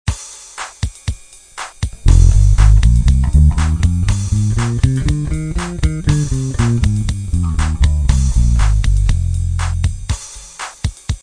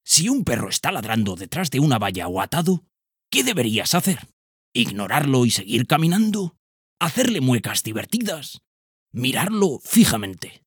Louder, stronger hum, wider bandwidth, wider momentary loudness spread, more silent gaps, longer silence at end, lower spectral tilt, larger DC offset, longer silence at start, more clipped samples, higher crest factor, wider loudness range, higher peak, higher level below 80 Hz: first, -16 LUFS vs -21 LUFS; neither; second, 10.5 kHz vs over 20 kHz; first, 15 LU vs 9 LU; second, none vs 4.33-4.72 s, 6.59-6.97 s, 8.67-9.06 s; about the same, 0.05 s vs 0.15 s; first, -6 dB/octave vs -4 dB/octave; neither; about the same, 0.05 s vs 0.05 s; neither; second, 14 dB vs 20 dB; about the same, 4 LU vs 2 LU; about the same, 0 dBFS vs -2 dBFS; first, -16 dBFS vs -54 dBFS